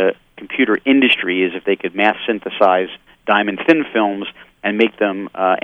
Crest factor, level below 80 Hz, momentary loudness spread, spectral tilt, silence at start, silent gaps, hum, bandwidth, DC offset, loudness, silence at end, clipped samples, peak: 16 dB; -60 dBFS; 12 LU; -6.5 dB/octave; 0 s; none; none; 6.4 kHz; under 0.1%; -16 LUFS; 0.05 s; under 0.1%; 0 dBFS